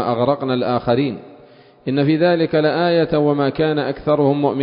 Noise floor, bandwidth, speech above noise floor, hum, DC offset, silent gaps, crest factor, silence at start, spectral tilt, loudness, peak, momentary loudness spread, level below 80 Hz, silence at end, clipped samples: -46 dBFS; 5.4 kHz; 29 dB; none; under 0.1%; none; 14 dB; 0 s; -12 dB/octave; -17 LUFS; -4 dBFS; 5 LU; -50 dBFS; 0 s; under 0.1%